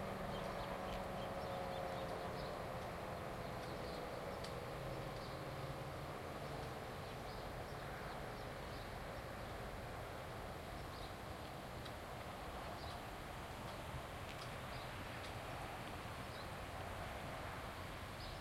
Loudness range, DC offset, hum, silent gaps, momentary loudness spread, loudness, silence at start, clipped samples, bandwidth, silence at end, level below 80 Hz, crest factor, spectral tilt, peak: 3 LU; under 0.1%; none; none; 4 LU; -48 LUFS; 0 s; under 0.1%; 16.5 kHz; 0 s; -58 dBFS; 14 dB; -5 dB/octave; -34 dBFS